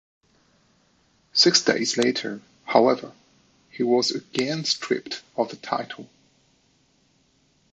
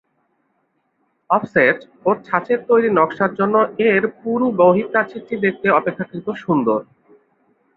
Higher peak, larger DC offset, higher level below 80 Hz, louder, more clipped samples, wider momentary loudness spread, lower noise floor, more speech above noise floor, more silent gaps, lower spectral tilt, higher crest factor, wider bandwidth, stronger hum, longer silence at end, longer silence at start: about the same, -2 dBFS vs -2 dBFS; neither; second, -72 dBFS vs -62 dBFS; second, -23 LUFS vs -18 LUFS; neither; first, 16 LU vs 8 LU; about the same, -64 dBFS vs -67 dBFS; second, 41 dB vs 50 dB; neither; second, -3 dB/octave vs -9 dB/octave; first, 24 dB vs 18 dB; first, 8.8 kHz vs 4.7 kHz; neither; first, 1.7 s vs 0.95 s; about the same, 1.35 s vs 1.3 s